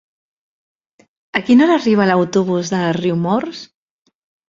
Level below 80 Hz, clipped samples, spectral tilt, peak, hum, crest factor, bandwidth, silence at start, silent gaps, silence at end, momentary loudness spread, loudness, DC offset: -60 dBFS; under 0.1%; -6 dB/octave; 0 dBFS; none; 16 dB; 7.6 kHz; 1.35 s; none; 0.85 s; 10 LU; -15 LUFS; under 0.1%